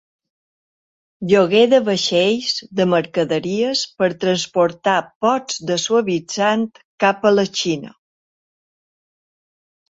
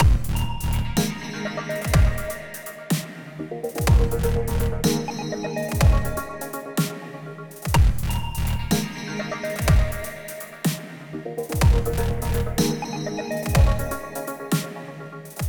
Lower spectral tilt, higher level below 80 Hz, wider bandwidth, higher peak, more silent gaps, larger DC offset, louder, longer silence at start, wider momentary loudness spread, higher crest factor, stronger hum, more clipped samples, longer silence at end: second, -4 dB/octave vs -5.5 dB/octave; second, -62 dBFS vs -26 dBFS; second, 8 kHz vs over 20 kHz; about the same, -2 dBFS vs -4 dBFS; first, 5.15-5.21 s, 6.85-6.98 s vs none; neither; first, -18 LUFS vs -24 LUFS; first, 1.2 s vs 0 s; second, 7 LU vs 14 LU; about the same, 18 dB vs 18 dB; neither; neither; first, 2 s vs 0 s